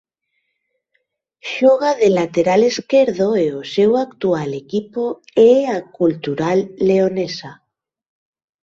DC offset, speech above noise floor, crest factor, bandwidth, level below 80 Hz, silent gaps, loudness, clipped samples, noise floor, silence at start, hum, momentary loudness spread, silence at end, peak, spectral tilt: under 0.1%; 56 dB; 16 dB; 7.8 kHz; -60 dBFS; none; -17 LUFS; under 0.1%; -72 dBFS; 1.45 s; none; 10 LU; 1.1 s; -2 dBFS; -6 dB/octave